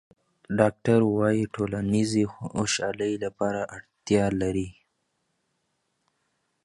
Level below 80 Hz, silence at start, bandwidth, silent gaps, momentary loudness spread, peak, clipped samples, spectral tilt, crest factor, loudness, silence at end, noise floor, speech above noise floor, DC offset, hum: -54 dBFS; 0.5 s; 11.5 kHz; none; 10 LU; -4 dBFS; under 0.1%; -5.5 dB/octave; 24 dB; -26 LUFS; 1.95 s; -76 dBFS; 51 dB; under 0.1%; none